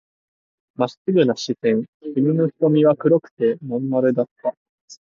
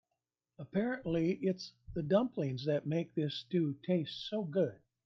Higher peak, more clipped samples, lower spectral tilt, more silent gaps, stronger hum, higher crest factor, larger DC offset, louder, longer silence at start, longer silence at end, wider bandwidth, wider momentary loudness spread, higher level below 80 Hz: first, -4 dBFS vs -18 dBFS; neither; about the same, -7.5 dB/octave vs -7.5 dB/octave; first, 0.97-1.05 s, 1.88-2.00 s, 3.31-3.37 s, 4.31-4.36 s, 4.57-4.88 s vs none; neither; about the same, 16 dB vs 18 dB; neither; first, -20 LUFS vs -35 LUFS; first, 0.8 s vs 0.6 s; second, 0.1 s vs 0.3 s; about the same, 7.4 kHz vs 7 kHz; about the same, 9 LU vs 7 LU; second, -70 dBFS vs -64 dBFS